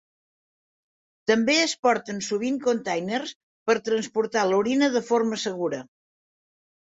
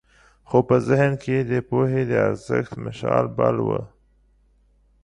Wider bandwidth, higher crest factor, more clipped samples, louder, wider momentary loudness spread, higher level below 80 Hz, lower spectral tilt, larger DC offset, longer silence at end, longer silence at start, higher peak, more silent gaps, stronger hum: second, 8 kHz vs 10.5 kHz; about the same, 18 dB vs 18 dB; neither; about the same, -24 LUFS vs -22 LUFS; first, 10 LU vs 7 LU; second, -70 dBFS vs -52 dBFS; second, -3.5 dB/octave vs -8.5 dB/octave; neither; second, 1 s vs 1.15 s; first, 1.25 s vs 0.5 s; second, -8 dBFS vs -4 dBFS; first, 1.79-1.83 s, 3.35-3.66 s vs none; neither